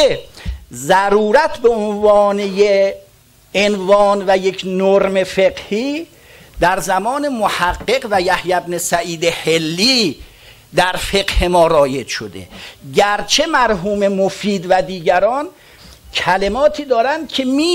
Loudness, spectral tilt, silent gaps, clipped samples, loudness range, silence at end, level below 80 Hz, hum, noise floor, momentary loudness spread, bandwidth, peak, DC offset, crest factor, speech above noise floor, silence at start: -15 LUFS; -4 dB/octave; none; under 0.1%; 3 LU; 0 s; -34 dBFS; none; -48 dBFS; 11 LU; 16.5 kHz; -2 dBFS; under 0.1%; 14 dB; 33 dB; 0 s